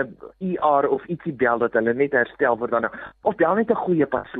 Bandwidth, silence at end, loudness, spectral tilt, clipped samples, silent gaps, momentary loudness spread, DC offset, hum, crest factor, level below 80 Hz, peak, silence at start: 4 kHz; 0 s; -22 LUFS; -10.5 dB/octave; under 0.1%; none; 9 LU; under 0.1%; none; 16 dB; -58 dBFS; -6 dBFS; 0 s